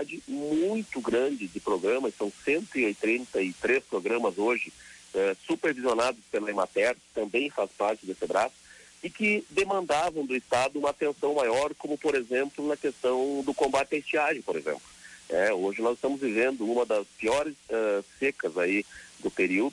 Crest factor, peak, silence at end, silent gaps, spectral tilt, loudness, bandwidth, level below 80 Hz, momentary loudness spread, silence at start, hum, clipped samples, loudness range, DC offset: 14 dB; -14 dBFS; 0 s; none; -4 dB/octave; -28 LUFS; 11.5 kHz; -64 dBFS; 6 LU; 0 s; none; under 0.1%; 1 LU; under 0.1%